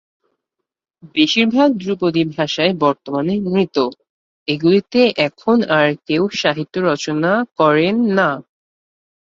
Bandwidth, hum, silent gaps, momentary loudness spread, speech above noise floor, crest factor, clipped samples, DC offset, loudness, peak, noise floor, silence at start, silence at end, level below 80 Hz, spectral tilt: 7.6 kHz; none; 4.10-4.46 s; 6 LU; 65 dB; 16 dB; under 0.1%; under 0.1%; -16 LUFS; -2 dBFS; -81 dBFS; 1.05 s; 0.85 s; -60 dBFS; -5.5 dB/octave